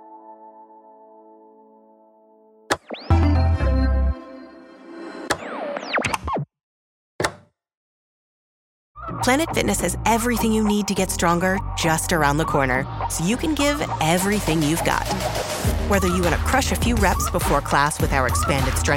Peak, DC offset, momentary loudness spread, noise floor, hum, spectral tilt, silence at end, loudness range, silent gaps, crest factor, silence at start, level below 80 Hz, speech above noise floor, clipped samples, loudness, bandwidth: -4 dBFS; under 0.1%; 8 LU; -53 dBFS; none; -4.5 dB/octave; 0 s; 8 LU; 6.63-7.19 s, 7.77-8.95 s; 18 dB; 0 s; -30 dBFS; 33 dB; under 0.1%; -21 LUFS; 16.5 kHz